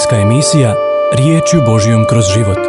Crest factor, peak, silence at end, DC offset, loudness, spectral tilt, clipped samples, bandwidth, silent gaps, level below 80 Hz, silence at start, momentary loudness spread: 10 dB; 0 dBFS; 0 s; under 0.1%; -10 LUFS; -5.5 dB/octave; under 0.1%; 11.5 kHz; none; -38 dBFS; 0 s; 2 LU